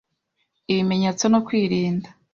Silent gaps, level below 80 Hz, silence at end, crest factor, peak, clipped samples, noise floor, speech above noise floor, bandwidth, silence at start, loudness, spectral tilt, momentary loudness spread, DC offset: none; -60 dBFS; 0.25 s; 16 dB; -6 dBFS; under 0.1%; -74 dBFS; 53 dB; 7.4 kHz; 0.7 s; -21 LUFS; -5.5 dB/octave; 6 LU; under 0.1%